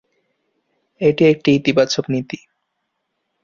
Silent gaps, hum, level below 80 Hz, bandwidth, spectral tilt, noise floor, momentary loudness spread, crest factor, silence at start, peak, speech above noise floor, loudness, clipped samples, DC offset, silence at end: none; none; -58 dBFS; 7.6 kHz; -5.5 dB/octave; -74 dBFS; 13 LU; 18 dB; 1 s; -2 dBFS; 58 dB; -16 LUFS; under 0.1%; under 0.1%; 1.1 s